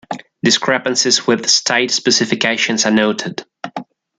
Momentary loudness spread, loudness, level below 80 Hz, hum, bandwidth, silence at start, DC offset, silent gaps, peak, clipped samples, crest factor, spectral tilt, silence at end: 16 LU; -14 LUFS; -62 dBFS; none; 10.5 kHz; 0.1 s; under 0.1%; none; 0 dBFS; under 0.1%; 16 dB; -2 dB/octave; 0.35 s